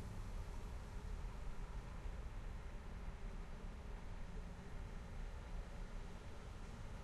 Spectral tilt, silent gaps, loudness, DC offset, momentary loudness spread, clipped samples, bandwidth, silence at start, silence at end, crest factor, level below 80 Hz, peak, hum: -6 dB/octave; none; -53 LUFS; under 0.1%; 3 LU; under 0.1%; 12.5 kHz; 0 s; 0 s; 12 dB; -50 dBFS; -36 dBFS; none